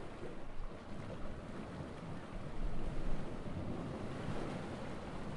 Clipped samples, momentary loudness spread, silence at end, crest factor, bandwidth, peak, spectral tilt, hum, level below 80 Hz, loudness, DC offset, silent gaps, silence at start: under 0.1%; 6 LU; 0 s; 16 dB; 10.5 kHz; -24 dBFS; -7 dB/octave; none; -46 dBFS; -46 LUFS; under 0.1%; none; 0 s